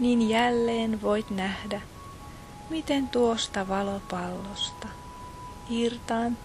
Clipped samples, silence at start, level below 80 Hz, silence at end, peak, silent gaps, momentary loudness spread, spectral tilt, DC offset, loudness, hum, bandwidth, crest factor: under 0.1%; 0 s; -50 dBFS; 0 s; -10 dBFS; none; 19 LU; -4.5 dB/octave; under 0.1%; -28 LUFS; none; 13 kHz; 20 dB